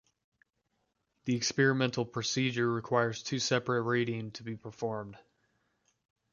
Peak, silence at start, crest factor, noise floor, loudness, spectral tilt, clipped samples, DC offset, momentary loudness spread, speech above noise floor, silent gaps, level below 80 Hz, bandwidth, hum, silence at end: -12 dBFS; 1.25 s; 22 dB; -80 dBFS; -31 LUFS; -4.5 dB/octave; under 0.1%; under 0.1%; 14 LU; 48 dB; none; -72 dBFS; 7.4 kHz; none; 1.15 s